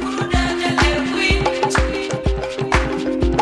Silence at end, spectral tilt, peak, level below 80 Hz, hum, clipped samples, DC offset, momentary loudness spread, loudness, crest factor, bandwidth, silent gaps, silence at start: 0 s; -5 dB/octave; -2 dBFS; -24 dBFS; none; under 0.1%; under 0.1%; 5 LU; -19 LUFS; 16 dB; 12 kHz; none; 0 s